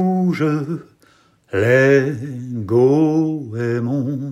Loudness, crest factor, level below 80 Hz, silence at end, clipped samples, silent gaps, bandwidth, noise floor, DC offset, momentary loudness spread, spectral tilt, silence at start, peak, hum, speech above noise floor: -18 LUFS; 16 dB; -64 dBFS; 0 s; under 0.1%; none; 13 kHz; -55 dBFS; under 0.1%; 14 LU; -8 dB/octave; 0 s; -2 dBFS; none; 37 dB